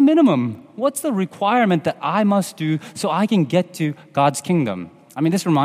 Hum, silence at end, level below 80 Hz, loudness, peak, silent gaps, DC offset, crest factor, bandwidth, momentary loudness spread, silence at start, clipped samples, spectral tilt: none; 0 s; -68 dBFS; -20 LUFS; -4 dBFS; none; under 0.1%; 16 dB; 15.5 kHz; 8 LU; 0 s; under 0.1%; -6 dB/octave